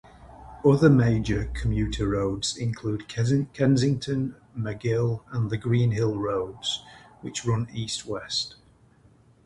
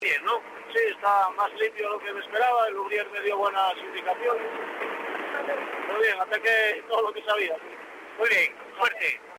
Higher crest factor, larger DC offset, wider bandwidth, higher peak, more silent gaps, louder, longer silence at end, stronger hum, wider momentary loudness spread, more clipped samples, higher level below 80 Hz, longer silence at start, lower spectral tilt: about the same, 20 dB vs 16 dB; neither; second, 11.5 kHz vs 16 kHz; first, -4 dBFS vs -12 dBFS; neither; about the same, -26 LUFS vs -26 LUFS; first, 0.95 s vs 0 s; neither; about the same, 10 LU vs 9 LU; neither; first, -42 dBFS vs -76 dBFS; first, 0.2 s vs 0 s; first, -6 dB/octave vs -1.5 dB/octave